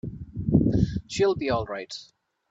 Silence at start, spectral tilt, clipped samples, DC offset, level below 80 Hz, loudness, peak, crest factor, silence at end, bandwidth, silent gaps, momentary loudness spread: 0.05 s; -7 dB/octave; under 0.1%; under 0.1%; -42 dBFS; -25 LUFS; -6 dBFS; 20 dB; 0.45 s; 8 kHz; none; 15 LU